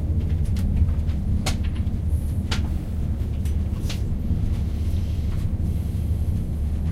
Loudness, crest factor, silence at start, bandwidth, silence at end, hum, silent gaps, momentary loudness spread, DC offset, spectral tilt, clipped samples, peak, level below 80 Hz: -26 LUFS; 14 dB; 0 s; 13.5 kHz; 0 s; none; none; 3 LU; under 0.1%; -7 dB/octave; under 0.1%; -8 dBFS; -26 dBFS